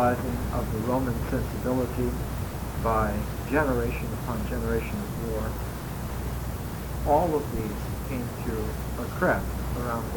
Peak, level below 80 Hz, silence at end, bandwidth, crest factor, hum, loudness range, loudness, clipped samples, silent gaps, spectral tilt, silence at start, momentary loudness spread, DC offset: -10 dBFS; -36 dBFS; 0 s; 19 kHz; 18 dB; none; 2 LU; -29 LUFS; under 0.1%; none; -6.5 dB/octave; 0 s; 8 LU; under 0.1%